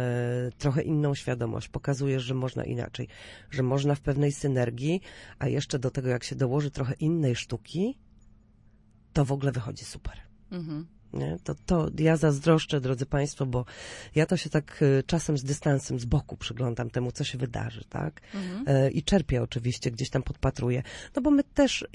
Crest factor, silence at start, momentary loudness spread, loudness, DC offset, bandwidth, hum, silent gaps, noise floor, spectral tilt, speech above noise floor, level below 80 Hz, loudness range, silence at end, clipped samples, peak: 20 dB; 0 s; 12 LU; -28 LUFS; under 0.1%; 11.5 kHz; none; none; -58 dBFS; -6.5 dB/octave; 30 dB; -46 dBFS; 5 LU; 0.05 s; under 0.1%; -8 dBFS